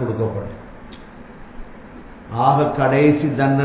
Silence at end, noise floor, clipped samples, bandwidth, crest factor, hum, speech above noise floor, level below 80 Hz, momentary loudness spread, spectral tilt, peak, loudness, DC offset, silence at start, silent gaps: 0 s; -38 dBFS; under 0.1%; 4 kHz; 18 dB; none; 21 dB; -44 dBFS; 25 LU; -12 dB/octave; -2 dBFS; -18 LUFS; under 0.1%; 0 s; none